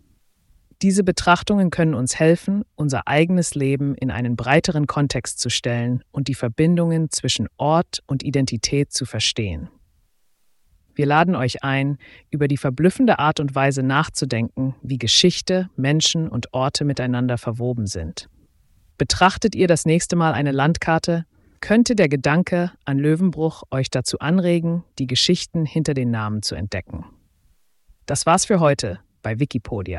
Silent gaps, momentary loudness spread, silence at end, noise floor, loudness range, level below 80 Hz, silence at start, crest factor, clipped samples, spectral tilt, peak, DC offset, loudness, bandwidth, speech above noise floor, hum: none; 9 LU; 0 s; -63 dBFS; 4 LU; -46 dBFS; 0.8 s; 18 dB; under 0.1%; -5 dB/octave; -2 dBFS; under 0.1%; -20 LUFS; 12 kHz; 44 dB; none